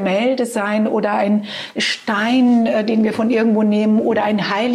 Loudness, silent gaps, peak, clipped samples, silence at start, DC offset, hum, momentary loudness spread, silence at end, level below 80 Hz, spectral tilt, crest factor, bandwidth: -17 LUFS; none; -4 dBFS; under 0.1%; 0 s; under 0.1%; none; 5 LU; 0 s; -66 dBFS; -5.5 dB/octave; 12 dB; 12.5 kHz